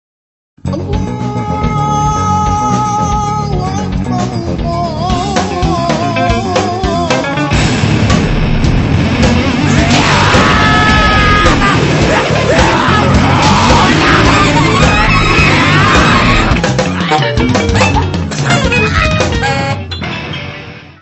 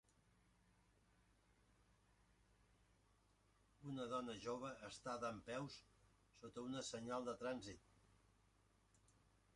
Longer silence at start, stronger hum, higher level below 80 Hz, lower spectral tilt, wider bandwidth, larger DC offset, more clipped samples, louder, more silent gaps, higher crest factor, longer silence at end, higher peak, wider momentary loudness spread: second, 0.65 s vs 3.8 s; neither; first, -20 dBFS vs -78 dBFS; about the same, -5 dB/octave vs -4.5 dB/octave; second, 8.8 kHz vs 11 kHz; neither; first, 0.3% vs under 0.1%; first, -10 LUFS vs -50 LUFS; neither; second, 10 dB vs 20 dB; second, 0.1 s vs 0.45 s; first, 0 dBFS vs -34 dBFS; about the same, 9 LU vs 11 LU